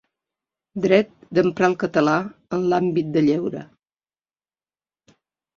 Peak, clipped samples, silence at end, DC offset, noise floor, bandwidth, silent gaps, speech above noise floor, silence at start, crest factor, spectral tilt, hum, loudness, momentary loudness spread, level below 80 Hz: -2 dBFS; under 0.1%; 1.95 s; under 0.1%; under -90 dBFS; 7.2 kHz; none; over 70 dB; 0.75 s; 20 dB; -7 dB/octave; none; -21 LUFS; 9 LU; -62 dBFS